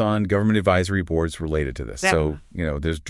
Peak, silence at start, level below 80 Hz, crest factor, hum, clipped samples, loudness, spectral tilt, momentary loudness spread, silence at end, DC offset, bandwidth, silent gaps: -2 dBFS; 0 s; -38 dBFS; 20 dB; none; under 0.1%; -22 LUFS; -6 dB/octave; 8 LU; 0 s; under 0.1%; 12 kHz; none